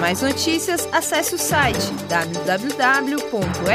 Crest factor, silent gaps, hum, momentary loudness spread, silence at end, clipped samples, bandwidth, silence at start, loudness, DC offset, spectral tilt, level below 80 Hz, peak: 16 dB; none; none; 5 LU; 0 s; under 0.1%; 16 kHz; 0 s; -20 LUFS; under 0.1%; -3 dB/octave; -46 dBFS; -4 dBFS